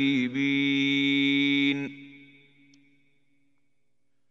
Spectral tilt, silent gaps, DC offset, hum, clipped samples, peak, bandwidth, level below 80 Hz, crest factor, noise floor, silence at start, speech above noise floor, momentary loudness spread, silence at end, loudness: -5 dB/octave; none; under 0.1%; 60 Hz at -75 dBFS; under 0.1%; -14 dBFS; 7.2 kHz; -82 dBFS; 14 dB; -80 dBFS; 0 s; 55 dB; 10 LU; 2.15 s; -24 LUFS